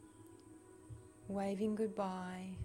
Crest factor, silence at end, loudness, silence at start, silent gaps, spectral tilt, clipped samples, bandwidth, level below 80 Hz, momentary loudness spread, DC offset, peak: 16 dB; 0 s; -41 LUFS; 0 s; none; -7 dB/octave; under 0.1%; 15.5 kHz; -64 dBFS; 21 LU; under 0.1%; -26 dBFS